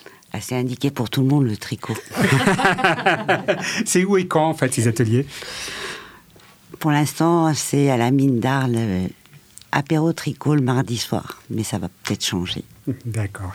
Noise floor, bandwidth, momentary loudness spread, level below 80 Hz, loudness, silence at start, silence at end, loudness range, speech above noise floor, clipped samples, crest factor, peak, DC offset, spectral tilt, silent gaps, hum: -49 dBFS; 17 kHz; 11 LU; -54 dBFS; -20 LUFS; 0.35 s; 0 s; 4 LU; 29 dB; under 0.1%; 20 dB; 0 dBFS; under 0.1%; -5 dB/octave; none; none